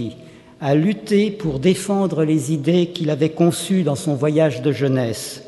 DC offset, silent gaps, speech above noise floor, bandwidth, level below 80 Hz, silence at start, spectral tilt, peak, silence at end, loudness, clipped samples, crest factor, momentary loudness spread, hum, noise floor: under 0.1%; none; 23 dB; 12 kHz; -52 dBFS; 0 s; -6.5 dB/octave; -4 dBFS; 0 s; -19 LUFS; under 0.1%; 16 dB; 4 LU; none; -41 dBFS